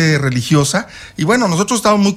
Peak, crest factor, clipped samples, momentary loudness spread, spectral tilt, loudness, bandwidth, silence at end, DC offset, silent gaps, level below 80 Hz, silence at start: -2 dBFS; 12 dB; under 0.1%; 7 LU; -5 dB/octave; -14 LUFS; 15.5 kHz; 0 s; under 0.1%; none; -44 dBFS; 0 s